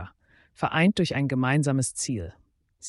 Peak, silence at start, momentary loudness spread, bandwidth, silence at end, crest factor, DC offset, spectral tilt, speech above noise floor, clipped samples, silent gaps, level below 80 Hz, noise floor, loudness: -10 dBFS; 0 s; 12 LU; 11.5 kHz; 0 s; 18 dB; under 0.1%; -5 dB/octave; 33 dB; under 0.1%; none; -54 dBFS; -57 dBFS; -25 LUFS